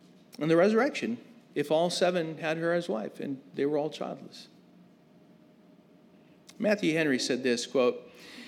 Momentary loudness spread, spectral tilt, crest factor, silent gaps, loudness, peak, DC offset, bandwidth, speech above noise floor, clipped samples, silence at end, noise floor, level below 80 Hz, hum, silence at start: 14 LU; -5 dB/octave; 18 dB; none; -29 LUFS; -12 dBFS; under 0.1%; 15 kHz; 29 dB; under 0.1%; 0 s; -58 dBFS; -86 dBFS; none; 0.4 s